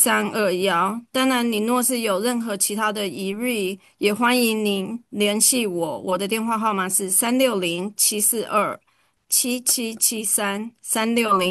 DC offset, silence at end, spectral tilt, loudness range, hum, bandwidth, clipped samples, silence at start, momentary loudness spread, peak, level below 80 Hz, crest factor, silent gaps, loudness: under 0.1%; 0 s; -2.5 dB/octave; 2 LU; none; 13 kHz; under 0.1%; 0 s; 9 LU; -2 dBFS; -70 dBFS; 18 dB; none; -21 LUFS